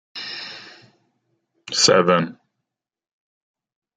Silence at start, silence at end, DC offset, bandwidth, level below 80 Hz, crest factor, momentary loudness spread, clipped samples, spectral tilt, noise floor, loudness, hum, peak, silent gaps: 0.15 s; 1.65 s; under 0.1%; 9.6 kHz; -66 dBFS; 24 dB; 19 LU; under 0.1%; -3 dB/octave; -82 dBFS; -18 LUFS; none; 0 dBFS; none